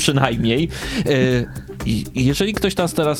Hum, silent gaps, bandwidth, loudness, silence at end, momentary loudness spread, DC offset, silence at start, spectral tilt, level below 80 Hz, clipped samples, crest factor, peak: none; none; 17 kHz; -19 LUFS; 0 s; 6 LU; under 0.1%; 0 s; -5 dB/octave; -36 dBFS; under 0.1%; 18 dB; 0 dBFS